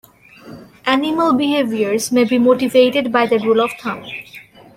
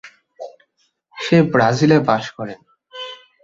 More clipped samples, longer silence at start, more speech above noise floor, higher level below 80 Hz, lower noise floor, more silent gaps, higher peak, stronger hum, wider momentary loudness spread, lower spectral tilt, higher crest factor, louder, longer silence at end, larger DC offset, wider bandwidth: neither; first, 0.45 s vs 0.05 s; second, 26 dB vs 50 dB; about the same, -58 dBFS vs -56 dBFS; second, -41 dBFS vs -65 dBFS; neither; about the same, -2 dBFS vs -2 dBFS; neither; second, 13 LU vs 23 LU; second, -4 dB/octave vs -6.5 dB/octave; about the same, 16 dB vs 18 dB; about the same, -16 LUFS vs -16 LUFS; about the same, 0.35 s vs 0.3 s; neither; first, 16 kHz vs 7.8 kHz